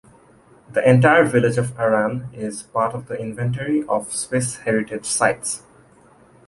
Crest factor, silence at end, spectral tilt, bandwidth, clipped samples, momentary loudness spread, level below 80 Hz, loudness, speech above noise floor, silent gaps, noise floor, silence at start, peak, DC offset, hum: 18 dB; 0.9 s; -5 dB/octave; 11.5 kHz; under 0.1%; 14 LU; -56 dBFS; -20 LUFS; 32 dB; none; -51 dBFS; 0.7 s; -2 dBFS; under 0.1%; none